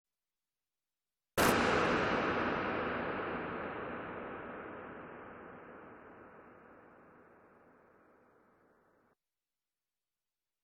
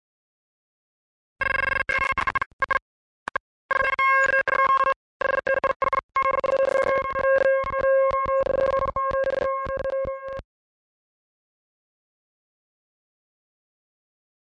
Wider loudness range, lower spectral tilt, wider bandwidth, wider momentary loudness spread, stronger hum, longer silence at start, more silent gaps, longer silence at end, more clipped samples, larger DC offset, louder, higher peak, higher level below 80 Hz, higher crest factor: first, 22 LU vs 8 LU; about the same, -4.5 dB/octave vs -4.5 dB/octave; first, 10.5 kHz vs 9.2 kHz; first, 24 LU vs 9 LU; neither; about the same, 1.35 s vs 1.4 s; second, none vs 2.46-2.59 s, 2.82-3.26 s, 3.40-3.69 s, 4.96-5.20 s, 5.76-5.80 s, 6.03-6.09 s; second, 3.4 s vs 4 s; neither; neither; second, -35 LUFS vs -23 LUFS; about the same, -14 dBFS vs -12 dBFS; second, -62 dBFS vs -50 dBFS; first, 24 dB vs 12 dB